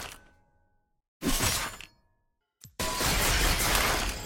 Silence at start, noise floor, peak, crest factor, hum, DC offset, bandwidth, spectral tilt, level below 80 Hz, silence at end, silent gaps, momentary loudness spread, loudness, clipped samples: 0 s; -75 dBFS; -10 dBFS; 20 dB; none; under 0.1%; 17 kHz; -2 dB/octave; -36 dBFS; 0 s; 1.08-1.20 s; 16 LU; -27 LUFS; under 0.1%